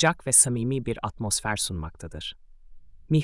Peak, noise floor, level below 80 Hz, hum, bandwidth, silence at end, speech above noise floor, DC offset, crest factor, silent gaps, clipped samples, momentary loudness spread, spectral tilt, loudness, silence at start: -6 dBFS; -45 dBFS; -48 dBFS; none; 12 kHz; 0 s; 20 dB; under 0.1%; 20 dB; none; under 0.1%; 19 LU; -3.5 dB/octave; -23 LUFS; 0 s